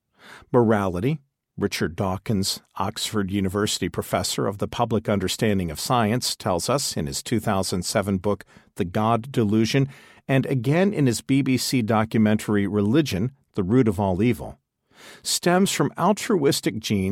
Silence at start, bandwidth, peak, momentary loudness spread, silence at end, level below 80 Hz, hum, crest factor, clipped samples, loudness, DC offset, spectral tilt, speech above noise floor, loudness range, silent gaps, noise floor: 0.25 s; 16.5 kHz; -6 dBFS; 7 LU; 0 s; -52 dBFS; none; 18 dB; under 0.1%; -23 LUFS; under 0.1%; -5 dB/octave; 26 dB; 3 LU; none; -48 dBFS